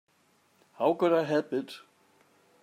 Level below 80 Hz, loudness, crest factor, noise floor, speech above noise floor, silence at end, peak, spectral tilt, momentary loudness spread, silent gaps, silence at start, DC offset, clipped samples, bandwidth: -82 dBFS; -28 LUFS; 18 dB; -67 dBFS; 40 dB; 0.85 s; -12 dBFS; -6.5 dB/octave; 17 LU; none; 0.8 s; under 0.1%; under 0.1%; 14.5 kHz